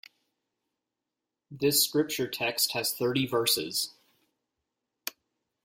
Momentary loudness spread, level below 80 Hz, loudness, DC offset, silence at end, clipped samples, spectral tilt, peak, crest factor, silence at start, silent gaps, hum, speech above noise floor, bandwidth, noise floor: 16 LU; -72 dBFS; -27 LUFS; under 0.1%; 0.55 s; under 0.1%; -2.5 dB/octave; -10 dBFS; 22 dB; 1.5 s; none; none; 59 dB; 16.5 kHz; -87 dBFS